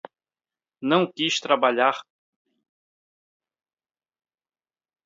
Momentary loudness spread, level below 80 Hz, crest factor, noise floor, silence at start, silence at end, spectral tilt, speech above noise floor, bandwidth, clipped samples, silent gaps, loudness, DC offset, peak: 9 LU; -78 dBFS; 24 dB; under -90 dBFS; 0.8 s; 3.05 s; -4 dB/octave; over 68 dB; 7.8 kHz; under 0.1%; none; -22 LUFS; under 0.1%; -4 dBFS